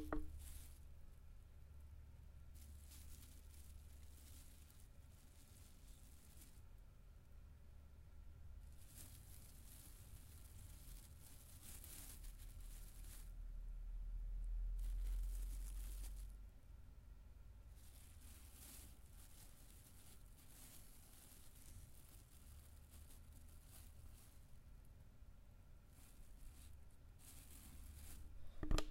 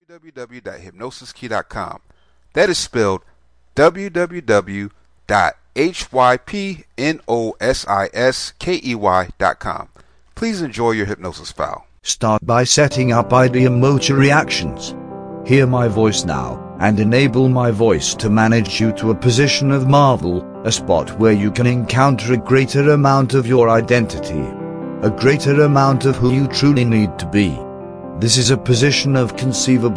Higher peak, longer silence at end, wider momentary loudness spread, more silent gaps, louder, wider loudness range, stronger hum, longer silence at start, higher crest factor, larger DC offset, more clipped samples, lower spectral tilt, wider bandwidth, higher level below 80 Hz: second, -26 dBFS vs 0 dBFS; about the same, 0 s vs 0 s; about the same, 14 LU vs 14 LU; neither; second, -59 LUFS vs -16 LUFS; first, 12 LU vs 5 LU; neither; about the same, 0 s vs 0.1 s; first, 28 dB vs 16 dB; neither; neither; about the same, -4.5 dB/octave vs -5 dB/octave; first, 16 kHz vs 10.5 kHz; second, -54 dBFS vs -42 dBFS